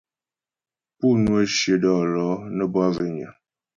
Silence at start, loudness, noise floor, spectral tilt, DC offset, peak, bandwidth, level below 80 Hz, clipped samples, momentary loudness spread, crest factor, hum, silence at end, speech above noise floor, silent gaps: 1 s; -22 LUFS; under -90 dBFS; -5.5 dB/octave; under 0.1%; -8 dBFS; 7.6 kHz; -52 dBFS; under 0.1%; 9 LU; 16 dB; none; 0.45 s; over 69 dB; none